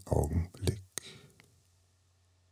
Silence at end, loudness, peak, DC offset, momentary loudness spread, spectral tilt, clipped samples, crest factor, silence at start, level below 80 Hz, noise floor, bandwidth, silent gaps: 1.35 s; -35 LUFS; -12 dBFS; under 0.1%; 19 LU; -6 dB/octave; under 0.1%; 26 dB; 0.05 s; -44 dBFS; -69 dBFS; 15 kHz; none